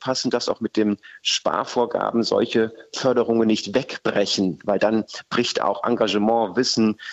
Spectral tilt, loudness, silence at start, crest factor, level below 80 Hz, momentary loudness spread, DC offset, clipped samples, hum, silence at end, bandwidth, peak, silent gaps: -4 dB/octave; -22 LUFS; 0 s; 14 dB; -62 dBFS; 5 LU; under 0.1%; under 0.1%; none; 0 s; 8.2 kHz; -6 dBFS; none